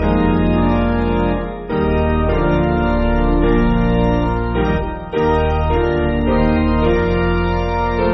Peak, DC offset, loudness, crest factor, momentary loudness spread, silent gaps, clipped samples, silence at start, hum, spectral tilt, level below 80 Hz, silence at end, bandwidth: -2 dBFS; under 0.1%; -17 LUFS; 14 dB; 4 LU; none; under 0.1%; 0 s; none; -6.5 dB/octave; -22 dBFS; 0 s; 6 kHz